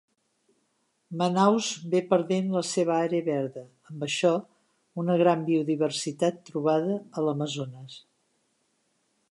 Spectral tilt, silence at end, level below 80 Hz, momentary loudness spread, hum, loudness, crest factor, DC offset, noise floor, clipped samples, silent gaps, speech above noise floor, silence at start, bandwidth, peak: -5.5 dB/octave; 1.35 s; -80 dBFS; 14 LU; none; -26 LUFS; 20 dB; under 0.1%; -73 dBFS; under 0.1%; none; 47 dB; 1.1 s; 11.5 kHz; -8 dBFS